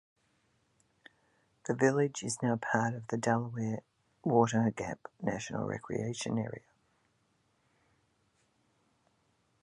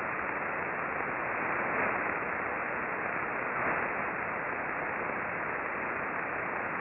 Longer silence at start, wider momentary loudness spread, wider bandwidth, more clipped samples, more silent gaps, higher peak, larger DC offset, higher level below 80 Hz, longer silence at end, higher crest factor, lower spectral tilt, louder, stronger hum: first, 1.65 s vs 0 s; first, 12 LU vs 3 LU; first, 11.5 kHz vs 4.1 kHz; neither; neither; first, -12 dBFS vs -16 dBFS; neither; second, -70 dBFS vs -64 dBFS; first, 3.05 s vs 0 s; first, 24 dB vs 16 dB; second, -5.5 dB/octave vs -9.5 dB/octave; about the same, -33 LUFS vs -32 LUFS; neither